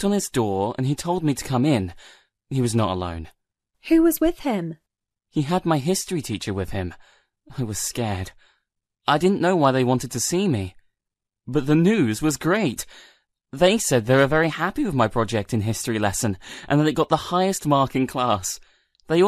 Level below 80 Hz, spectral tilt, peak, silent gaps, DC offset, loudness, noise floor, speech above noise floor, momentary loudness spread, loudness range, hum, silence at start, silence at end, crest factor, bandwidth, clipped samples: -46 dBFS; -5 dB/octave; -4 dBFS; none; under 0.1%; -22 LUFS; -85 dBFS; 64 dB; 12 LU; 5 LU; none; 0 s; 0 s; 18 dB; 14 kHz; under 0.1%